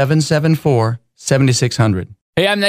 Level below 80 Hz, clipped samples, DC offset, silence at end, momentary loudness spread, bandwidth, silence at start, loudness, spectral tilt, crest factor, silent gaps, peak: -48 dBFS; under 0.1%; under 0.1%; 0 s; 9 LU; 16 kHz; 0 s; -16 LUFS; -5.5 dB/octave; 14 dB; 2.21-2.33 s; 0 dBFS